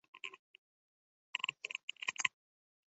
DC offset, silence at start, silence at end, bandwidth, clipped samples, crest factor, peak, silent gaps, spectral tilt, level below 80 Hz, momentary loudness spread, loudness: under 0.1%; 0.15 s; 0.6 s; 8 kHz; under 0.1%; 32 dB; -12 dBFS; 0.39-1.33 s, 1.83-1.88 s; 4 dB/octave; under -90 dBFS; 13 LU; -40 LUFS